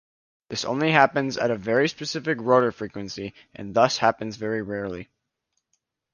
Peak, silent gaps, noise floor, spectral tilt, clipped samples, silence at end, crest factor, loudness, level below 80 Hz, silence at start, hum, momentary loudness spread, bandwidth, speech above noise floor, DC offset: -2 dBFS; none; -78 dBFS; -5 dB/octave; under 0.1%; 1.1 s; 24 dB; -24 LUFS; -60 dBFS; 0.5 s; none; 15 LU; 10 kHz; 54 dB; under 0.1%